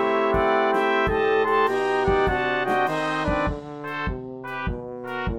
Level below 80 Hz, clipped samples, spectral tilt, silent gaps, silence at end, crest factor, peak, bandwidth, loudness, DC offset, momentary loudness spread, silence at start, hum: -38 dBFS; under 0.1%; -6 dB/octave; none; 0 s; 16 dB; -8 dBFS; 13.5 kHz; -23 LUFS; 0.2%; 11 LU; 0 s; none